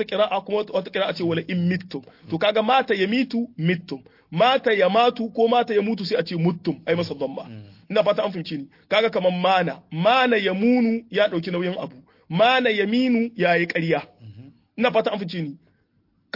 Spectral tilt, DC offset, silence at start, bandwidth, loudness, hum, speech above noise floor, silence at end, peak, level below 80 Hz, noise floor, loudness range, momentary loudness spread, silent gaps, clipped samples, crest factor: -7 dB/octave; under 0.1%; 0 s; 5.8 kHz; -22 LUFS; none; 44 dB; 0.8 s; -4 dBFS; -68 dBFS; -66 dBFS; 3 LU; 13 LU; none; under 0.1%; 18 dB